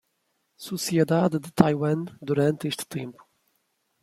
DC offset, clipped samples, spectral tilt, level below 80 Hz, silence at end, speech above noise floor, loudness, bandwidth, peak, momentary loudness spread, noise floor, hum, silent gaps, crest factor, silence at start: under 0.1%; under 0.1%; -6 dB/octave; -62 dBFS; 0.9 s; 50 dB; -25 LUFS; 16 kHz; -2 dBFS; 14 LU; -74 dBFS; none; none; 24 dB; 0.6 s